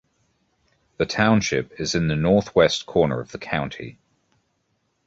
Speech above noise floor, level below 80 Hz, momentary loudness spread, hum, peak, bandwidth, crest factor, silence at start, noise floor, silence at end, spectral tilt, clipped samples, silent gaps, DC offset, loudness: 50 dB; -48 dBFS; 11 LU; none; -2 dBFS; 8 kHz; 22 dB; 1 s; -71 dBFS; 1.15 s; -5 dB/octave; under 0.1%; none; under 0.1%; -22 LUFS